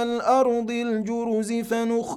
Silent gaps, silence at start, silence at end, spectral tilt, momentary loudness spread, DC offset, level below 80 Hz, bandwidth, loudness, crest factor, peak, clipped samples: none; 0 s; 0 s; -5 dB/octave; 6 LU; under 0.1%; -62 dBFS; 14.5 kHz; -24 LUFS; 14 dB; -8 dBFS; under 0.1%